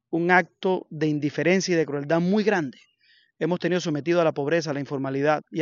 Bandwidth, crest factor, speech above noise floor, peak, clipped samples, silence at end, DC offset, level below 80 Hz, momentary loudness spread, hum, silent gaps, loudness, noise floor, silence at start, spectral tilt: 7.4 kHz; 20 dB; 38 dB; -4 dBFS; under 0.1%; 0 s; under 0.1%; -74 dBFS; 7 LU; none; none; -24 LUFS; -62 dBFS; 0.1 s; -5 dB/octave